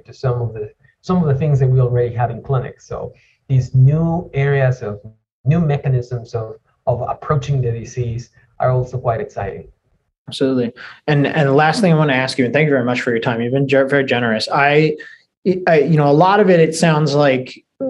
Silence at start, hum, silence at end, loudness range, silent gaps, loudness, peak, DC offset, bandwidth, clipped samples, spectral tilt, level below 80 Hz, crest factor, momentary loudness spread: 0.1 s; none; 0 s; 7 LU; 5.32-5.44 s, 10.18-10.25 s, 15.37-15.42 s; -16 LUFS; 0 dBFS; under 0.1%; 11.5 kHz; under 0.1%; -7 dB/octave; -46 dBFS; 16 dB; 15 LU